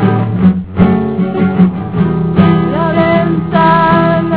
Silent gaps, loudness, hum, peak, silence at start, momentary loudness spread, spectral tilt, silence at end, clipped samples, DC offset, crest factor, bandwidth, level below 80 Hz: none; -11 LUFS; none; 0 dBFS; 0 s; 5 LU; -12 dB/octave; 0 s; 0.5%; 1%; 10 dB; 4 kHz; -34 dBFS